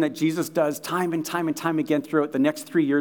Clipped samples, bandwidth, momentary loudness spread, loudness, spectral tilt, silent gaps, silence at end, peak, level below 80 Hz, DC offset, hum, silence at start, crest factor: under 0.1%; 19.5 kHz; 3 LU; -24 LUFS; -5.5 dB/octave; none; 0 s; -8 dBFS; -80 dBFS; under 0.1%; none; 0 s; 16 dB